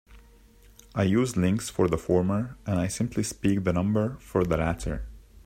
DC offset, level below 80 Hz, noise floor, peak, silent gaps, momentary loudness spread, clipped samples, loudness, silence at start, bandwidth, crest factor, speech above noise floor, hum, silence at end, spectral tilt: under 0.1%; -44 dBFS; -54 dBFS; -10 dBFS; none; 8 LU; under 0.1%; -27 LUFS; 0.1 s; 16 kHz; 18 dB; 29 dB; none; 0.05 s; -6.5 dB/octave